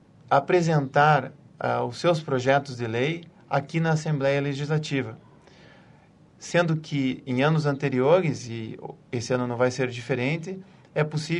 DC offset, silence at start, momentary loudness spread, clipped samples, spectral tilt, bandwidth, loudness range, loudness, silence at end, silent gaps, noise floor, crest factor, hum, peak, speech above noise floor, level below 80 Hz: under 0.1%; 0.3 s; 13 LU; under 0.1%; -6.5 dB/octave; 10.5 kHz; 4 LU; -25 LUFS; 0 s; none; -55 dBFS; 20 dB; none; -6 dBFS; 30 dB; -64 dBFS